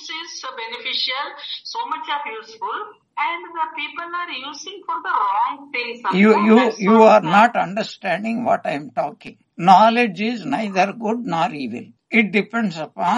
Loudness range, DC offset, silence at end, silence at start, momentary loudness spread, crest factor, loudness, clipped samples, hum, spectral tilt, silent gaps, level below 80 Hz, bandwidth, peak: 10 LU; under 0.1%; 0 s; 0 s; 17 LU; 20 dB; -19 LUFS; under 0.1%; none; -5.5 dB/octave; none; -72 dBFS; 10 kHz; 0 dBFS